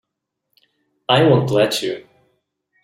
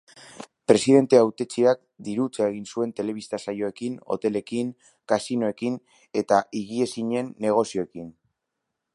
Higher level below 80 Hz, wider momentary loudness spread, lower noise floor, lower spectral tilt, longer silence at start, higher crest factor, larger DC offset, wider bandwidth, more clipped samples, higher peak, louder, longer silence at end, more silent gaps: first, -58 dBFS vs -68 dBFS; first, 18 LU vs 14 LU; about the same, -79 dBFS vs -82 dBFS; about the same, -5.5 dB/octave vs -5.5 dB/octave; first, 1.1 s vs 0.4 s; about the same, 18 dB vs 22 dB; neither; first, 15.5 kHz vs 11.5 kHz; neither; about the same, -2 dBFS vs -2 dBFS; first, -16 LUFS vs -24 LUFS; about the same, 0.85 s vs 0.85 s; neither